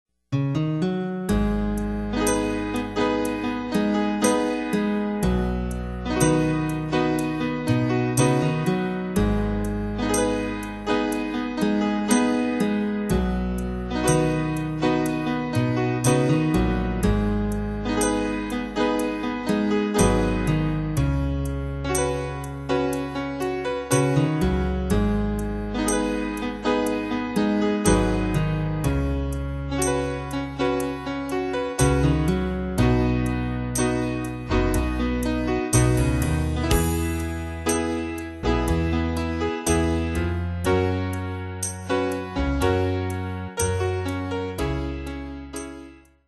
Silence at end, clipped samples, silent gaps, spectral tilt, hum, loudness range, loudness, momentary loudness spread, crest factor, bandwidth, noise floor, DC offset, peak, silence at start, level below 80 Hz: 0.35 s; under 0.1%; none; -5.5 dB/octave; none; 2 LU; -24 LUFS; 7 LU; 18 dB; 13 kHz; -45 dBFS; under 0.1%; -4 dBFS; 0.3 s; -32 dBFS